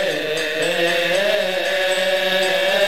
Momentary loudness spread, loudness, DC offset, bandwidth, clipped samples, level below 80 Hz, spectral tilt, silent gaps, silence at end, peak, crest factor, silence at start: 3 LU; -18 LUFS; 1%; 16.5 kHz; under 0.1%; -58 dBFS; -2 dB/octave; none; 0 s; -6 dBFS; 14 dB; 0 s